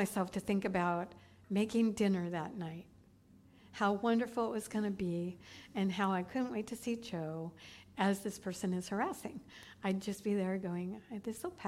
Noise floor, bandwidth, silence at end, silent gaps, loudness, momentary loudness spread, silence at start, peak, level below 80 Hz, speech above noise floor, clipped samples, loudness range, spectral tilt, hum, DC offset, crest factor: -63 dBFS; 16 kHz; 0 s; none; -37 LUFS; 12 LU; 0 s; -20 dBFS; -70 dBFS; 26 dB; under 0.1%; 3 LU; -6 dB/octave; none; under 0.1%; 18 dB